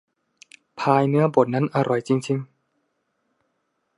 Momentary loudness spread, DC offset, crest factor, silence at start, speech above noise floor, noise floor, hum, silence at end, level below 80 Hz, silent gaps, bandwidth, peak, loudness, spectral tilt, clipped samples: 8 LU; under 0.1%; 20 dB; 0.75 s; 53 dB; -73 dBFS; none; 1.55 s; -72 dBFS; none; 11.5 kHz; -2 dBFS; -21 LUFS; -7.5 dB/octave; under 0.1%